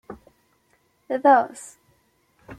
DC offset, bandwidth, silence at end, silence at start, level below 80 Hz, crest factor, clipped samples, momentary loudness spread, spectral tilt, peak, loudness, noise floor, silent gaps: under 0.1%; 13 kHz; 0.05 s; 0.1 s; -64 dBFS; 20 dB; under 0.1%; 27 LU; -4.5 dB/octave; -4 dBFS; -20 LUFS; -65 dBFS; none